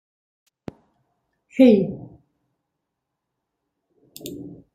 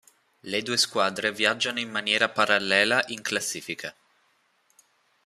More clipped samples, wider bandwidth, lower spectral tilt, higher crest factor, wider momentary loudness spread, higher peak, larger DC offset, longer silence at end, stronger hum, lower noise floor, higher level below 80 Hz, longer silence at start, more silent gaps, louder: neither; about the same, 15.5 kHz vs 15 kHz; first, -7.5 dB/octave vs -1.5 dB/octave; about the same, 22 dB vs 24 dB; first, 26 LU vs 13 LU; about the same, -2 dBFS vs -4 dBFS; neither; second, 0.25 s vs 1.35 s; neither; first, -81 dBFS vs -68 dBFS; first, -62 dBFS vs -72 dBFS; first, 1.55 s vs 0.45 s; neither; first, -17 LUFS vs -24 LUFS